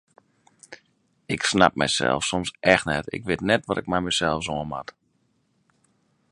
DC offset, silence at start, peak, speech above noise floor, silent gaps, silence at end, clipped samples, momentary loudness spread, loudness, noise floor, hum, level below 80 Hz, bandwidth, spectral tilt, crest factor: under 0.1%; 0.7 s; 0 dBFS; 45 dB; none; 1.5 s; under 0.1%; 11 LU; -23 LUFS; -68 dBFS; none; -50 dBFS; 11.5 kHz; -3.5 dB/octave; 26 dB